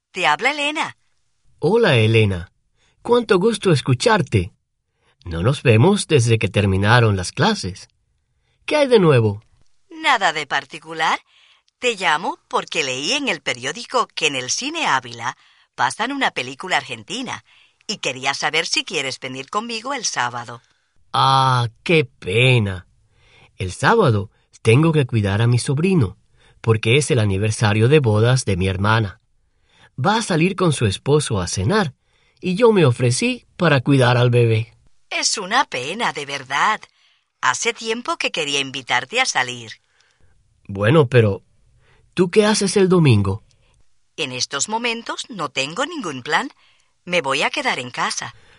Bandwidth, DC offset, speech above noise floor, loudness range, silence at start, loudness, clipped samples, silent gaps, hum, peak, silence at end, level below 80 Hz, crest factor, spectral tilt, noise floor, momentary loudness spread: 11 kHz; under 0.1%; 51 dB; 5 LU; 0.15 s; -18 LUFS; under 0.1%; none; none; 0 dBFS; 0.25 s; -52 dBFS; 18 dB; -5 dB/octave; -69 dBFS; 12 LU